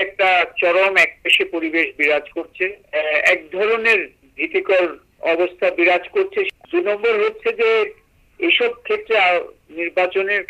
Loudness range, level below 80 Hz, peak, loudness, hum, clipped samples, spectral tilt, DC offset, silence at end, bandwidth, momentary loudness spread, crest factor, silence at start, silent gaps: 2 LU; -60 dBFS; -4 dBFS; -17 LUFS; none; under 0.1%; -3 dB/octave; under 0.1%; 0.05 s; 15 kHz; 9 LU; 14 dB; 0 s; none